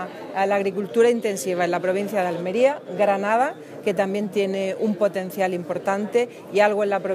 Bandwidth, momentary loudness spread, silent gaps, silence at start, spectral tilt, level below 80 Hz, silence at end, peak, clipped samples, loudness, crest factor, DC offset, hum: 16 kHz; 6 LU; none; 0 s; -5.5 dB/octave; -76 dBFS; 0 s; -4 dBFS; under 0.1%; -22 LUFS; 18 dB; under 0.1%; none